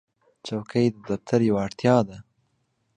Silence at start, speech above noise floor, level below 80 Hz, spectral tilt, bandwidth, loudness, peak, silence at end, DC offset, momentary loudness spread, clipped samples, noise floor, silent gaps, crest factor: 0.45 s; 48 dB; -58 dBFS; -7 dB/octave; 9.8 kHz; -24 LUFS; -4 dBFS; 0.75 s; under 0.1%; 12 LU; under 0.1%; -71 dBFS; none; 20 dB